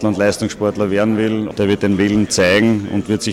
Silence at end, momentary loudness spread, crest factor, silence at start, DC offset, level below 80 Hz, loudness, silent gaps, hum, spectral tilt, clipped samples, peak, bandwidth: 0 s; 6 LU; 10 dB; 0 s; under 0.1%; -46 dBFS; -16 LUFS; none; none; -5 dB/octave; under 0.1%; -6 dBFS; 15 kHz